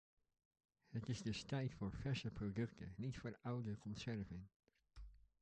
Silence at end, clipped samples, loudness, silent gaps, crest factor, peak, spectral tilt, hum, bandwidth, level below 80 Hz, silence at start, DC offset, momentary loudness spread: 0.25 s; under 0.1%; -48 LUFS; 4.56-4.60 s; 16 dB; -32 dBFS; -6.5 dB/octave; none; 9 kHz; -64 dBFS; 0.9 s; under 0.1%; 18 LU